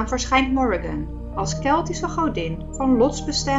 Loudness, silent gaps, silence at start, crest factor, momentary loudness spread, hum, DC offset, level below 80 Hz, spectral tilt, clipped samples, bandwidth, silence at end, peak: -22 LUFS; none; 0 s; 16 dB; 10 LU; none; under 0.1%; -34 dBFS; -4.5 dB/octave; under 0.1%; 8 kHz; 0 s; -4 dBFS